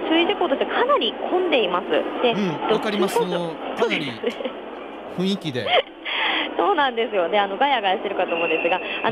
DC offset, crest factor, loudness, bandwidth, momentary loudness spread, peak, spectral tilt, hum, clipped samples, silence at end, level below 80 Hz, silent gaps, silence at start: under 0.1%; 14 dB; -21 LUFS; 15.5 kHz; 8 LU; -6 dBFS; -5 dB/octave; none; under 0.1%; 0 s; -62 dBFS; none; 0 s